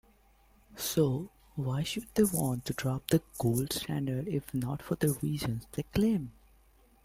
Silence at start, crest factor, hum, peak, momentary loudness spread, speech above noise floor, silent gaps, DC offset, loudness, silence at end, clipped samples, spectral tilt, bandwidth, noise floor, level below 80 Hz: 0.7 s; 20 dB; none; -12 dBFS; 7 LU; 32 dB; none; under 0.1%; -32 LUFS; 0.75 s; under 0.1%; -5.5 dB/octave; 16.5 kHz; -63 dBFS; -54 dBFS